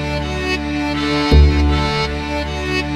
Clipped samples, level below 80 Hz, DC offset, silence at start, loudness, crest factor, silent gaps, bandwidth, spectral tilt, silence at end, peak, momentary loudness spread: under 0.1%; -20 dBFS; under 0.1%; 0 s; -17 LUFS; 16 dB; none; 10 kHz; -6 dB/octave; 0 s; 0 dBFS; 9 LU